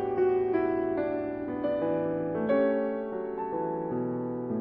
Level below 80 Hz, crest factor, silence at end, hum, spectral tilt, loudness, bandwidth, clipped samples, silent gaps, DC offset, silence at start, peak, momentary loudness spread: -62 dBFS; 14 dB; 0 s; none; -11 dB/octave; -29 LUFS; 4.5 kHz; under 0.1%; none; under 0.1%; 0 s; -14 dBFS; 7 LU